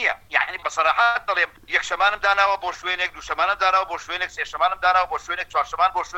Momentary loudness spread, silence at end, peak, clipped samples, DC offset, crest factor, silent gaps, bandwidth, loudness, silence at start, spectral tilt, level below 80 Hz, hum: 7 LU; 0 s; -4 dBFS; under 0.1%; under 0.1%; 18 dB; none; 16.5 kHz; -21 LUFS; 0 s; -1 dB/octave; -52 dBFS; none